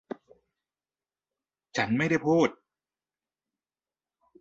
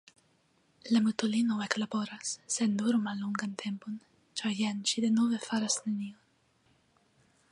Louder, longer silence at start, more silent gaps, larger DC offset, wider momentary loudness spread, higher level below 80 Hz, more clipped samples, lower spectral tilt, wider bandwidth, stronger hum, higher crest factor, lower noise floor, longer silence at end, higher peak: first, -27 LUFS vs -31 LUFS; first, 1.75 s vs 0.85 s; neither; neither; first, 18 LU vs 11 LU; first, -70 dBFS vs -78 dBFS; neither; first, -6 dB/octave vs -3.5 dB/octave; second, 7.8 kHz vs 11 kHz; neither; about the same, 22 dB vs 24 dB; first, under -90 dBFS vs -70 dBFS; first, 1.9 s vs 1.4 s; about the same, -10 dBFS vs -8 dBFS